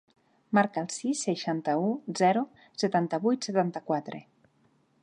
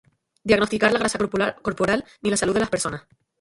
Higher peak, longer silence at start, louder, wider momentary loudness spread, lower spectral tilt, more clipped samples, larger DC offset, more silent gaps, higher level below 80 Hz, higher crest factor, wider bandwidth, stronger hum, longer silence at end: second, -10 dBFS vs -2 dBFS; about the same, 0.5 s vs 0.45 s; second, -29 LUFS vs -22 LUFS; about the same, 7 LU vs 7 LU; about the same, -5 dB/octave vs -4 dB/octave; neither; neither; neither; second, -80 dBFS vs -50 dBFS; about the same, 20 dB vs 22 dB; about the same, 11 kHz vs 11.5 kHz; neither; first, 0.8 s vs 0.4 s